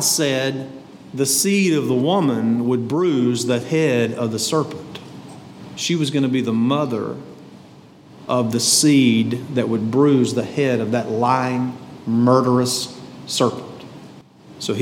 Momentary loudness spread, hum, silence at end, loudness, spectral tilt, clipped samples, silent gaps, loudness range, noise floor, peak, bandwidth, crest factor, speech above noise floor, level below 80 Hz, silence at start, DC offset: 20 LU; none; 0 s; -19 LUFS; -4.5 dB/octave; under 0.1%; none; 5 LU; -44 dBFS; -2 dBFS; 18 kHz; 18 dB; 26 dB; -66 dBFS; 0 s; under 0.1%